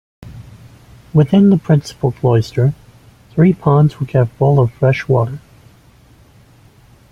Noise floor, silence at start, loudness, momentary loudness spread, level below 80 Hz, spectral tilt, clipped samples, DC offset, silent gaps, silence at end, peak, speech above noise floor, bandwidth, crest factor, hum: -46 dBFS; 0.25 s; -14 LUFS; 11 LU; -46 dBFS; -9 dB/octave; under 0.1%; under 0.1%; none; 1.75 s; -2 dBFS; 34 dB; 8.6 kHz; 14 dB; none